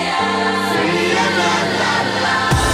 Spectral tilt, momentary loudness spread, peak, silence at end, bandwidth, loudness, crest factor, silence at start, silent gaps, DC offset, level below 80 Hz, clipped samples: -4 dB/octave; 2 LU; -4 dBFS; 0 s; 16 kHz; -16 LUFS; 12 dB; 0 s; none; under 0.1%; -34 dBFS; under 0.1%